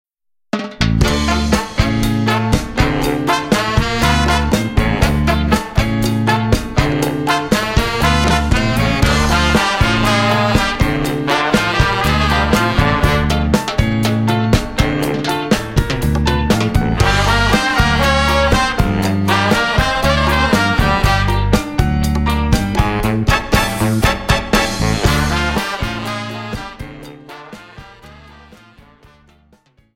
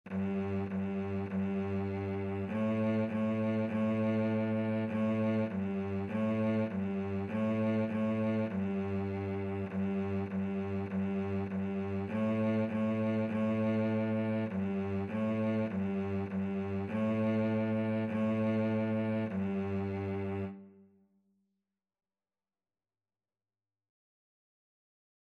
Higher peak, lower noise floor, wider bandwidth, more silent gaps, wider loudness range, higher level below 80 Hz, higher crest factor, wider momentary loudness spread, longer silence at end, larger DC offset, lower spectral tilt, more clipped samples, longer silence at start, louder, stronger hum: first, 0 dBFS vs -22 dBFS; second, -53 dBFS vs under -90 dBFS; first, 16.5 kHz vs 4.8 kHz; neither; about the same, 3 LU vs 3 LU; first, -22 dBFS vs -74 dBFS; about the same, 14 dB vs 12 dB; about the same, 5 LU vs 5 LU; second, 1.8 s vs 4.5 s; first, 0.1% vs under 0.1%; second, -5 dB/octave vs -9.5 dB/octave; neither; first, 0.55 s vs 0.05 s; first, -15 LUFS vs -34 LUFS; neither